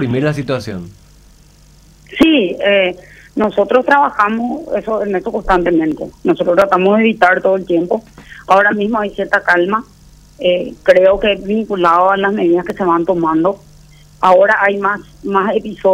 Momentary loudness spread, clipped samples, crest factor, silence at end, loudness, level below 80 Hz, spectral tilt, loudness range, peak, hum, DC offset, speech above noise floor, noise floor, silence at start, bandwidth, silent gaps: 9 LU; under 0.1%; 14 dB; 0 s; -13 LUFS; -40 dBFS; -6.5 dB/octave; 2 LU; 0 dBFS; none; under 0.1%; 31 dB; -44 dBFS; 0 s; 13.5 kHz; none